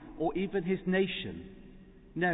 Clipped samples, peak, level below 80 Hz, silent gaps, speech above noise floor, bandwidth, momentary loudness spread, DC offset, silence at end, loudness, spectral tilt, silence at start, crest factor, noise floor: under 0.1%; -18 dBFS; -56 dBFS; none; 21 dB; 3.9 kHz; 18 LU; under 0.1%; 0 s; -32 LUFS; -3.5 dB/octave; 0 s; 16 dB; -53 dBFS